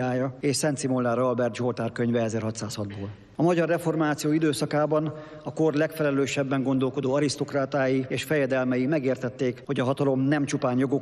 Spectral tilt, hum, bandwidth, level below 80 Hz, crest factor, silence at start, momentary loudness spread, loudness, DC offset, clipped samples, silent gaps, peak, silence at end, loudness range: -6 dB/octave; none; 13 kHz; -64 dBFS; 14 dB; 0 s; 6 LU; -26 LUFS; under 0.1%; under 0.1%; none; -12 dBFS; 0 s; 1 LU